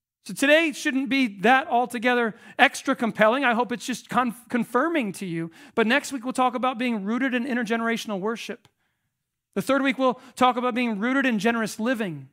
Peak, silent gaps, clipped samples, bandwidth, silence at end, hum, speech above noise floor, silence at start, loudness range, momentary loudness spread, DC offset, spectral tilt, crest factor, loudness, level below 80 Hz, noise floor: 0 dBFS; none; under 0.1%; 16 kHz; 0.05 s; none; 56 dB; 0.25 s; 5 LU; 10 LU; under 0.1%; -4.5 dB/octave; 24 dB; -24 LUFS; -74 dBFS; -80 dBFS